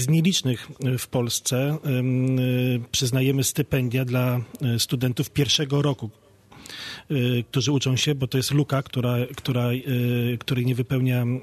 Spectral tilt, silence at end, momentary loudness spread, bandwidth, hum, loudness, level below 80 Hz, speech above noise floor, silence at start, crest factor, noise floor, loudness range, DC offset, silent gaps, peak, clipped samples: -5 dB/octave; 0 s; 6 LU; 14 kHz; none; -23 LUFS; -56 dBFS; 23 dB; 0 s; 16 dB; -46 dBFS; 2 LU; under 0.1%; none; -8 dBFS; under 0.1%